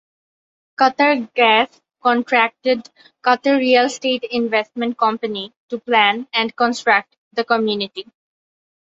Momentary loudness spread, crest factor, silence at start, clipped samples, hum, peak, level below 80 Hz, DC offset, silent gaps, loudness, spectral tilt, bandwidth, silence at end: 11 LU; 18 dB; 0.8 s; under 0.1%; none; -2 dBFS; -68 dBFS; under 0.1%; 5.56-5.69 s, 7.18-7.31 s; -18 LUFS; -3.5 dB/octave; 7.8 kHz; 0.95 s